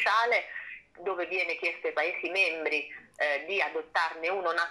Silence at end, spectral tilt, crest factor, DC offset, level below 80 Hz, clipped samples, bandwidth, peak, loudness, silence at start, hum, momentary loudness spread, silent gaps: 0 s; -2 dB/octave; 18 dB; under 0.1%; -76 dBFS; under 0.1%; 12.5 kHz; -12 dBFS; -29 LUFS; 0 s; none; 11 LU; none